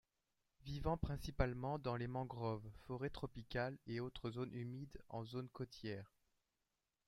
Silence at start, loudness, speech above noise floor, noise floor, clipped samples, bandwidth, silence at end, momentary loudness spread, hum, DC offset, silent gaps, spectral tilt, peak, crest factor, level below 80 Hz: 0.6 s; -46 LUFS; 45 dB; -90 dBFS; under 0.1%; 15.5 kHz; 1 s; 9 LU; none; under 0.1%; none; -7.5 dB/octave; -22 dBFS; 24 dB; -56 dBFS